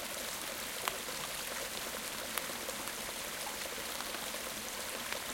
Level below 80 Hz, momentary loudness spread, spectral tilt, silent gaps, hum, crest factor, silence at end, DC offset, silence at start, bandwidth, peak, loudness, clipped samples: -64 dBFS; 2 LU; -0.5 dB/octave; none; none; 30 dB; 0 s; under 0.1%; 0 s; 17 kHz; -10 dBFS; -38 LUFS; under 0.1%